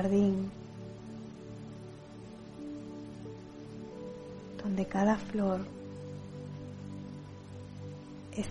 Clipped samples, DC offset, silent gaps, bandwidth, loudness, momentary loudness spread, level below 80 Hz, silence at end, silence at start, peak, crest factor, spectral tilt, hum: under 0.1%; under 0.1%; none; 11 kHz; -38 LUFS; 17 LU; -60 dBFS; 0 s; 0 s; -14 dBFS; 22 dB; -7.5 dB/octave; none